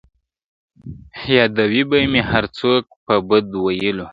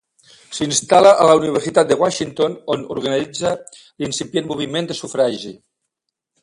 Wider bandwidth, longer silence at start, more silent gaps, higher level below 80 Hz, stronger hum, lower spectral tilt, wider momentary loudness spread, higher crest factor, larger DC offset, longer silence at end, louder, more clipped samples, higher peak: second, 7.6 kHz vs 11.5 kHz; first, 0.85 s vs 0.5 s; first, 2.96-3.06 s vs none; first, -44 dBFS vs -58 dBFS; neither; first, -7.5 dB/octave vs -4 dB/octave; about the same, 14 LU vs 14 LU; about the same, 18 dB vs 18 dB; neither; second, 0 s vs 0.9 s; about the same, -17 LUFS vs -17 LUFS; neither; about the same, 0 dBFS vs 0 dBFS